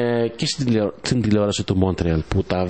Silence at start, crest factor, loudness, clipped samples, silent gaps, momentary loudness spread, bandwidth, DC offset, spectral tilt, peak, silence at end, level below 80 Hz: 0 s; 18 dB; -21 LUFS; under 0.1%; none; 3 LU; 8.8 kHz; 0.5%; -6 dB/octave; -2 dBFS; 0 s; -38 dBFS